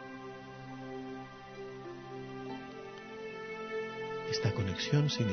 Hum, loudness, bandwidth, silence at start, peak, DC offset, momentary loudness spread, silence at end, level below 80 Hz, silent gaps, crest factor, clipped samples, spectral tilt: none; -38 LUFS; 6.4 kHz; 0 s; -16 dBFS; under 0.1%; 15 LU; 0 s; -66 dBFS; none; 20 dB; under 0.1%; -5 dB/octave